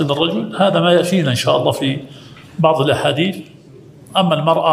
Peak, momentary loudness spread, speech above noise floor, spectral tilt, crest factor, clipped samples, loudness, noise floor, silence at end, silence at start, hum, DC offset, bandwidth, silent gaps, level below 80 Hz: 0 dBFS; 9 LU; 26 dB; -5.5 dB/octave; 16 dB; under 0.1%; -16 LUFS; -41 dBFS; 0 s; 0 s; none; under 0.1%; 16 kHz; none; -56 dBFS